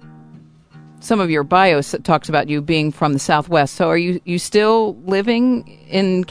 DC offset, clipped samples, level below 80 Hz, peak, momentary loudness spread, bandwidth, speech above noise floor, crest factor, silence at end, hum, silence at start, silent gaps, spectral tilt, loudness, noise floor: under 0.1%; under 0.1%; -52 dBFS; 0 dBFS; 6 LU; 11 kHz; 27 dB; 16 dB; 0.05 s; none; 0 s; none; -5.5 dB/octave; -17 LUFS; -44 dBFS